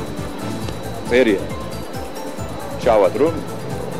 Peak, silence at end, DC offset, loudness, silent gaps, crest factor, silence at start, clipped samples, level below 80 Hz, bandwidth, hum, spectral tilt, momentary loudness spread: -4 dBFS; 0 s; 2%; -21 LUFS; none; 16 dB; 0 s; under 0.1%; -40 dBFS; 16 kHz; none; -5.5 dB/octave; 13 LU